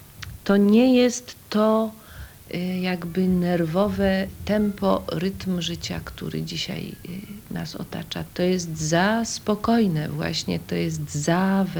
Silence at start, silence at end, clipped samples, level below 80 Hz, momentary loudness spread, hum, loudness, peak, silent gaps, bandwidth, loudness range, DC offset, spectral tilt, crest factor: 0 s; 0 s; under 0.1%; -46 dBFS; 13 LU; none; -23 LUFS; -6 dBFS; none; over 20 kHz; 7 LU; under 0.1%; -5.5 dB/octave; 16 dB